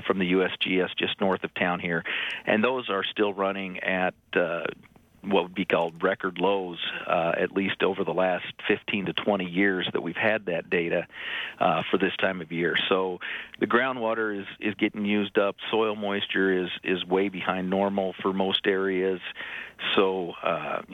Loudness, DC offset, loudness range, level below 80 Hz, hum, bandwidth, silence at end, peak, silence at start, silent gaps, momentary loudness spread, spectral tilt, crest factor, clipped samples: -26 LUFS; under 0.1%; 1 LU; -68 dBFS; none; 6.4 kHz; 0 s; -8 dBFS; 0 s; none; 6 LU; -7 dB/octave; 18 dB; under 0.1%